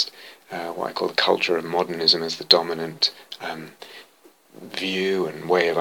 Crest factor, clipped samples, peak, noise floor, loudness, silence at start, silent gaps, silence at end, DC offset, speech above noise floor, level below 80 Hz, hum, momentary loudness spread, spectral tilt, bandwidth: 24 dB; under 0.1%; 0 dBFS; -53 dBFS; -22 LUFS; 0 s; none; 0 s; under 0.1%; 29 dB; -74 dBFS; none; 17 LU; -3.5 dB/octave; 19.5 kHz